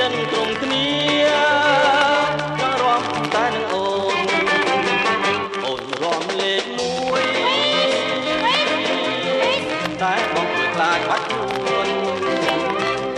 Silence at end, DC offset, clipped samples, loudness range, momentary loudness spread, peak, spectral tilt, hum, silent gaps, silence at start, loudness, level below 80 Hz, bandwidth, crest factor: 0 s; under 0.1%; under 0.1%; 2 LU; 6 LU; -4 dBFS; -3.5 dB/octave; none; none; 0 s; -19 LUFS; -56 dBFS; 12.5 kHz; 16 dB